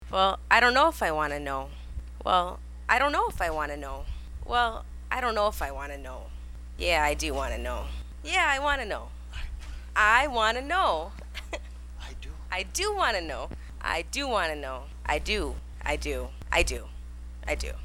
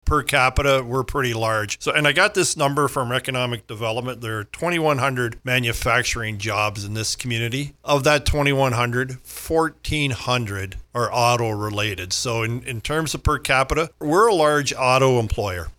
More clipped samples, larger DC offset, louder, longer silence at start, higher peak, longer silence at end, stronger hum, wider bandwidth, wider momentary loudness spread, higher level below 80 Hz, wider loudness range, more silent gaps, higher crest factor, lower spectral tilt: neither; neither; second, -27 LUFS vs -21 LUFS; about the same, 0 s vs 0.05 s; about the same, -4 dBFS vs -4 dBFS; about the same, 0 s vs 0.05 s; first, 60 Hz at -40 dBFS vs none; second, 16.5 kHz vs 19 kHz; first, 18 LU vs 9 LU; about the same, -38 dBFS vs -36 dBFS; about the same, 5 LU vs 3 LU; neither; first, 24 dB vs 18 dB; about the same, -3.5 dB/octave vs -4 dB/octave